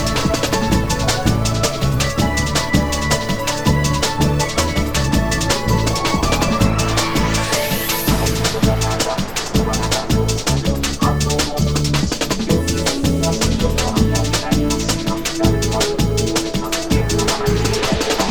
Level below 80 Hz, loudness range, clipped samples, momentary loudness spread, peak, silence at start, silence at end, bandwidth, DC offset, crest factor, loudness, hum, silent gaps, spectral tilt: -26 dBFS; 1 LU; under 0.1%; 2 LU; 0 dBFS; 0 s; 0 s; over 20 kHz; 0.3%; 16 dB; -17 LUFS; none; none; -4.5 dB/octave